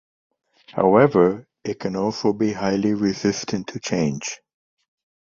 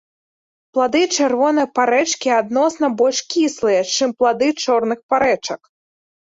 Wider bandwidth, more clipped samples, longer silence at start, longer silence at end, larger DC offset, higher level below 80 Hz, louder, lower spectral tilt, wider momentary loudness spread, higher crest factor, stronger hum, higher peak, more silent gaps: about the same, 7.6 kHz vs 8 kHz; neither; about the same, 0.7 s vs 0.75 s; first, 0.95 s vs 0.65 s; neither; about the same, -56 dBFS vs -60 dBFS; second, -21 LUFS vs -17 LUFS; first, -5.5 dB/octave vs -2.5 dB/octave; first, 15 LU vs 3 LU; first, 20 dB vs 14 dB; neither; about the same, -2 dBFS vs -4 dBFS; second, none vs 5.03-5.09 s